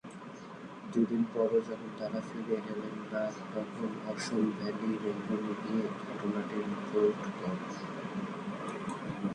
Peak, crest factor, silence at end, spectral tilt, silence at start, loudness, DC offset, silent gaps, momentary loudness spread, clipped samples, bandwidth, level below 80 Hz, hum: -16 dBFS; 18 dB; 0 s; -6.5 dB/octave; 0.05 s; -35 LUFS; under 0.1%; none; 9 LU; under 0.1%; 10.5 kHz; -72 dBFS; none